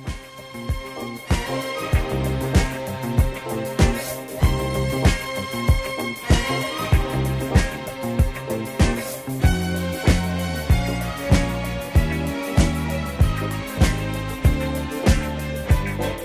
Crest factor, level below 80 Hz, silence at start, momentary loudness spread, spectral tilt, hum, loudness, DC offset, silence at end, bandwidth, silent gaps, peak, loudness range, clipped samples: 20 dB; -26 dBFS; 0 s; 7 LU; -5.5 dB/octave; none; -23 LUFS; under 0.1%; 0 s; 16 kHz; none; -2 dBFS; 1 LU; under 0.1%